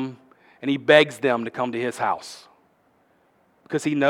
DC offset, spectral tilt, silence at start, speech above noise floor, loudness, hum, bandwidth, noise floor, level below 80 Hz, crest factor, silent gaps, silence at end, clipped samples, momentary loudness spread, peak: under 0.1%; -5 dB/octave; 0 s; 41 dB; -22 LUFS; none; 15 kHz; -62 dBFS; -76 dBFS; 22 dB; none; 0 s; under 0.1%; 17 LU; 0 dBFS